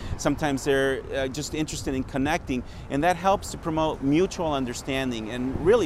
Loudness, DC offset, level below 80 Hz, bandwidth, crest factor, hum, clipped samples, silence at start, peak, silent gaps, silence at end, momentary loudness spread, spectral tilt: -26 LUFS; under 0.1%; -40 dBFS; 15.5 kHz; 18 dB; none; under 0.1%; 0 s; -8 dBFS; none; 0 s; 6 LU; -5 dB/octave